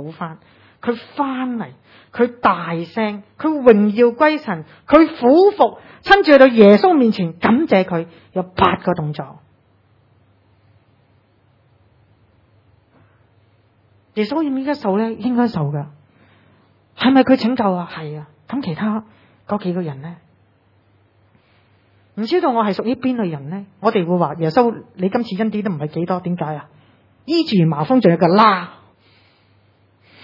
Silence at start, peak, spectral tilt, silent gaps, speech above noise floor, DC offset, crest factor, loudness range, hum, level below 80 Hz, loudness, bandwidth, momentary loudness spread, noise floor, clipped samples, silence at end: 0 s; 0 dBFS; -8.5 dB/octave; none; 40 dB; under 0.1%; 18 dB; 14 LU; none; -54 dBFS; -16 LUFS; 6 kHz; 17 LU; -56 dBFS; under 0.1%; 1.55 s